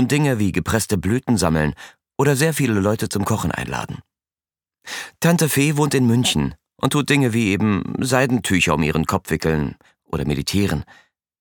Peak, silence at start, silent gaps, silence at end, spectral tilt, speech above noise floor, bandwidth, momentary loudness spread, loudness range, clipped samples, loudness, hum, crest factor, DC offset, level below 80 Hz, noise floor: -2 dBFS; 0 s; none; 0.55 s; -5 dB/octave; over 71 dB; 19 kHz; 11 LU; 4 LU; under 0.1%; -19 LUFS; none; 18 dB; under 0.1%; -40 dBFS; under -90 dBFS